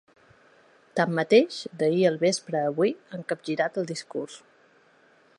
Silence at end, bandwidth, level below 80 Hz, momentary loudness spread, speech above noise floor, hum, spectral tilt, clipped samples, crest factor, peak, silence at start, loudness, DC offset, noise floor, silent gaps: 1 s; 11 kHz; -78 dBFS; 13 LU; 35 dB; none; -5 dB/octave; under 0.1%; 20 dB; -6 dBFS; 0.95 s; -26 LUFS; under 0.1%; -60 dBFS; none